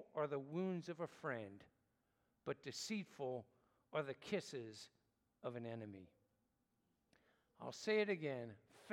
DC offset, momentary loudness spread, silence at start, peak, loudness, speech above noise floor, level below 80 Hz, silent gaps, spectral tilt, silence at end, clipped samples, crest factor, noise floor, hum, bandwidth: under 0.1%; 15 LU; 0 s; -26 dBFS; -46 LUFS; 39 dB; -90 dBFS; none; -5 dB/octave; 0 s; under 0.1%; 20 dB; -85 dBFS; none; 16 kHz